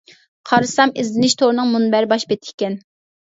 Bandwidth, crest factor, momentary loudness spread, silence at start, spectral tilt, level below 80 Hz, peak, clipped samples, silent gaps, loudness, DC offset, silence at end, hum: 8 kHz; 18 dB; 9 LU; 0.45 s; -4 dB/octave; -64 dBFS; 0 dBFS; under 0.1%; 2.54-2.58 s; -17 LUFS; under 0.1%; 0.5 s; none